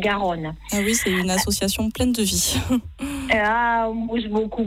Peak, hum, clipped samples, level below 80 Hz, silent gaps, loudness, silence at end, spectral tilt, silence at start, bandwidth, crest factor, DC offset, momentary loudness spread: -8 dBFS; none; under 0.1%; -38 dBFS; none; -21 LUFS; 0 s; -3.5 dB/octave; 0 s; 16.5 kHz; 14 dB; under 0.1%; 6 LU